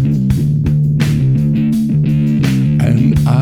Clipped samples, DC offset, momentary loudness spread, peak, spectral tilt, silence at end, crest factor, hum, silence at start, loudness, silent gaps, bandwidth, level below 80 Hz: under 0.1%; under 0.1%; 2 LU; -2 dBFS; -8 dB/octave; 0 s; 10 dB; none; 0 s; -13 LUFS; none; 13 kHz; -30 dBFS